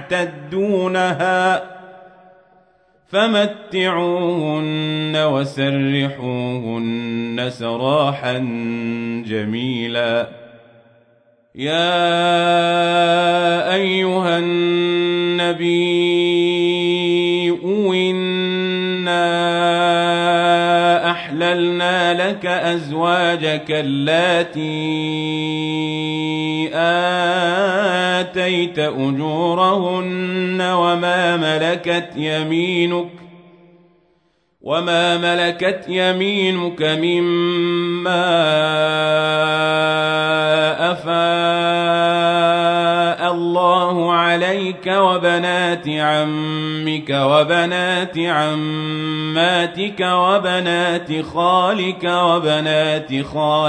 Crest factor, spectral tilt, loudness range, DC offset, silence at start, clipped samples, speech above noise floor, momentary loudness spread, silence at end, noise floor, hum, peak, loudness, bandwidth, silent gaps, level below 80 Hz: 16 dB; -5.5 dB/octave; 5 LU; under 0.1%; 0 s; under 0.1%; 45 dB; 7 LU; 0 s; -62 dBFS; none; -2 dBFS; -17 LUFS; 9.4 kHz; none; -62 dBFS